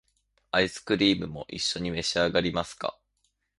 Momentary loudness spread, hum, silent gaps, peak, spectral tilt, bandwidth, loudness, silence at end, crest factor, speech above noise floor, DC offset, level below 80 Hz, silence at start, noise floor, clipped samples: 11 LU; none; none; -8 dBFS; -4 dB/octave; 11.5 kHz; -27 LUFS; 0.65 s; 22 dB; 48 dB; under 0.1%; -54 dBFS; 0.55 s; -75 dBFS; under 0.1%